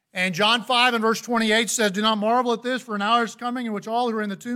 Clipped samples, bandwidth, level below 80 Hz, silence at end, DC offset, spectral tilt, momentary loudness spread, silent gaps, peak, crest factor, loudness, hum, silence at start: under 0.1%; 16.5 kHz; -70 dBFS; 0 s; under 0.1%; -3 dB/octave; 9 LU; none; -6 dBFS; 18 dB; -22 LUFS; none; 0.15 s